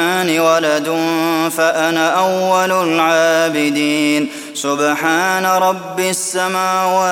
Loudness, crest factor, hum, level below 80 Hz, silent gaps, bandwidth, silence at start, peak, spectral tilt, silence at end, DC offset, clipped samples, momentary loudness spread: -15 LUFS; 14 dB; none; -64 dBFS; none; 17 kHz; 0 s; 0 dBFS; -3 dB/octave; 0 s; under 0.1%; under 0.1%; 4 LU